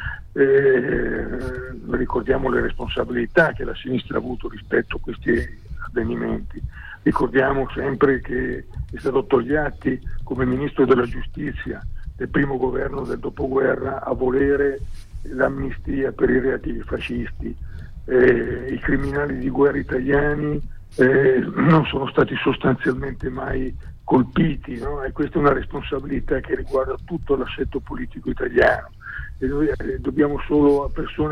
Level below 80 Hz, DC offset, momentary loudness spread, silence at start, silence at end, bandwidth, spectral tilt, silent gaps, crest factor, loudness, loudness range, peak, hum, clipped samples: -34 dBFS; under 0.1%; 13 LU; 0 s; 0 s; 10 kHz; -8.5 dB/octave; none; 16 dB; -21 LUFS; 4 LU; -4 dBFS; none; under 0.1%